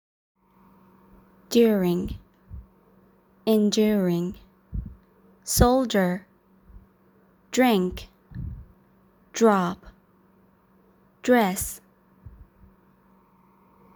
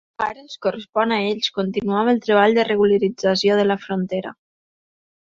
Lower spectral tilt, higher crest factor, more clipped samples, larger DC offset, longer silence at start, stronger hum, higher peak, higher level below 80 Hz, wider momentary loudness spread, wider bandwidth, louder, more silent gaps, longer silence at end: about the same, -5 dB/octave vs -5.5 dB/octave; first, 24 dB vs 18 dB; neither; neither; first, 1.5 s vs 0.2 s; neither; about the same, -2 dBFS vs -2 dBFS; first, -42 dBFS vs -60 dBFS; first, 22 LU vs 10 LU; first, over 20 kHz vs 7.4 kHz; second, -23 LUFS vs -20 LUFS; second, none vs 0.89-0.93 s; first, 1.55 s vs 0.9 s